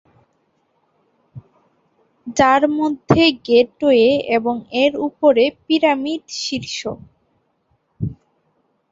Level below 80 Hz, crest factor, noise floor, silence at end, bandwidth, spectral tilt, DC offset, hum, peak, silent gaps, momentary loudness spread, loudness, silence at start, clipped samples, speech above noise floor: -50 dBFS; 18 dB; -65 dBFS; 0.8 s; 7.8 kHz; -5 dB/octave; under 0.1%; none; 0 dBFS; none; 15 LU; -17 LUFS; 1.35 s; under 0.1%; 49 dB